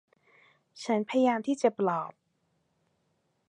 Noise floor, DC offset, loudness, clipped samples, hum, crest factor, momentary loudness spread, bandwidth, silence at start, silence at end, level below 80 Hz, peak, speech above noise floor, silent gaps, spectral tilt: -75 dBFS; under 0.1%; -28 LUFS; under 0.1%; none; 20 dB; 12 LU; 11 kHz; 0.75 s; 1.4 s; -84 dBFS; -10 dBFS; 47 dB; none; -5.5 dB/octave